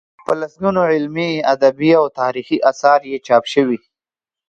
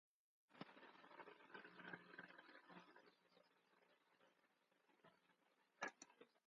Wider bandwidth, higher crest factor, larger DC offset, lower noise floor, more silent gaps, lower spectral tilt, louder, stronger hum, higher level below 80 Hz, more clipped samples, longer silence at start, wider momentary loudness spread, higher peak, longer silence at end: first, 9 kHz vs 6.2 kHz; second, 16 dB vs 30 dB; neither; first, -90 dBFS vs -83 dBFS; neither; first, -6 dB/octave vs -2 dB/octave; first, -16 LUFS vs -61 LUFS; neither; first, -60 dBFS vs under -90 dBFS; neither; second, 0.3 s vs 0.5 s; second, 7 LU vs 11 LU; first, 0 dBFS vs -34 dBFS; first, 0.7 s vs 0.1 s